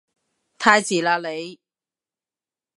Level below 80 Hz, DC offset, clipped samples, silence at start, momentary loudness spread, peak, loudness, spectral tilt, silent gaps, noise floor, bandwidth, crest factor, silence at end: -68 dBFS; under 0.1%; under 0.1%; 0.6 s; 16 LU; -2 dBFS; -19 LUFS; -3 dB/octave; none; under -90 dBFS; 11.5 kHz; 24 dB; 1.25 s